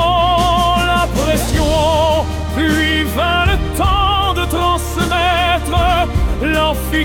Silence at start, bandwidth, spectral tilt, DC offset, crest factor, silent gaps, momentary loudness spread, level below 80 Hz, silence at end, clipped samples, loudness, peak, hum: 0 s; 18 kHz; -5 dB/octave; under 0.1%; 12 dB; none; 4 LU; -22 dBFS; 0 s; under 0.1%; -15 LUFS; -2 dBFS; none